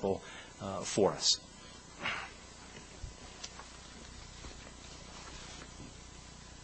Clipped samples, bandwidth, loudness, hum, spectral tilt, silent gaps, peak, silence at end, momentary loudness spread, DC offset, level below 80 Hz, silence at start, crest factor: under 0.1%; 8.4 kHz; -36 LUFS; none; -2.5 dB/octave; none; -14 dBFS; 0 s; 21 LU; under 0.1%; -56 dBFS; 0 s; 26 dB